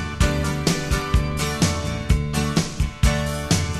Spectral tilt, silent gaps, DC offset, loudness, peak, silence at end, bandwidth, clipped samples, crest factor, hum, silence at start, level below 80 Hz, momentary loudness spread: -4.5 dB/octave; none; 0.3%; -22 LUFS; -4 dBFS; 0 s; 13 kHz; under 0.1%; 16 dB; none; 0 s; -26 dBFS; 3 LU